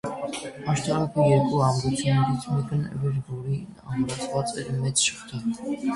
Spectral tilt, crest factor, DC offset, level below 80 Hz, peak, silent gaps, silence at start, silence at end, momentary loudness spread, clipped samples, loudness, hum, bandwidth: -5 dB/octave; 18 dB; under 0.1%; -54 dBFS; -8 dBFS; none; 0.05 s; 0 s; 11 LU; under 0.1%; -26 LUFS; none; 11.5 kHz